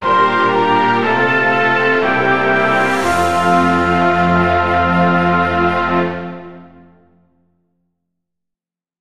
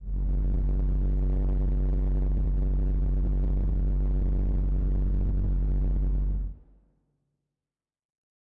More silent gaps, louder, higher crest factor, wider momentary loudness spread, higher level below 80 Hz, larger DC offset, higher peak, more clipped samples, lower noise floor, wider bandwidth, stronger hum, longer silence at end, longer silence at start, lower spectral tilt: neither; first, -13 LUFS vs -29 LUFS; first, 14 dB vs 4 dB; about the same, 3 LU vs 1 LU; second, -42 dBFS vs -26 dBFS; first, 2% vs under 0.1%; first, -2 dBFS vs -22 dBFS; neither; second, -85 dBFS vs under -90 dBFS; first, 13.5 kHz vs 1.7 kHz; neither; second, 0 s vs 1.95 s; about the same, 0 s vs 0 s; second, -6 dB/octave vs -12 dB/octave